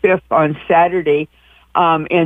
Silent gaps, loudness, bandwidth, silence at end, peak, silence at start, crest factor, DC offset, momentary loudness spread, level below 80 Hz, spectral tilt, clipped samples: none; -15 LUFS; 3.8 kHz; 0 s; 0 dBFS; 0.05 s; 14 dB; under 0.1%; 7 LU; -50 dBFS; -8.5 dB/octave; under 0.1%